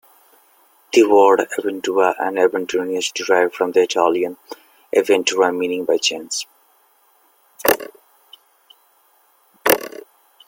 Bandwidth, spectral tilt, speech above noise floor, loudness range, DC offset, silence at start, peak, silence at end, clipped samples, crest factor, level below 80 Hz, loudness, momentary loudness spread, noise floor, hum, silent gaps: 17 kHz; -2.5 dB/octave; 40 dB; 7 LU; under 0.1%; 0.95 s; 0 dBFS; 0.6 s; under 0.1%; 20 dB; -64 dBFS; -18 LUFS; 12 LU; -57 dBFS; none; none